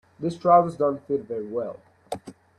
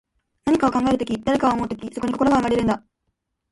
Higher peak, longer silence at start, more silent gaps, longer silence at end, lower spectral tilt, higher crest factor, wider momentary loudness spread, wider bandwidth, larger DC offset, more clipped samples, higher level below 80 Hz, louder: about the same, -4 dBFS vs -6 dBFS; second, 0.2 s vs 0.45 s; neither; second, 0.25 s vs 0.75 s; first, -7.5 dB/octave vs -6 dB/octave; about the same, 20 dB vs 16 dB; first, 18 LU vs 9 LU; about the same, 11.5 kHz vs 11.5 kHz; neither; neither; second, -66 dBFS vs -46 dBFS; second, -24 LUFS vs -21 LUFS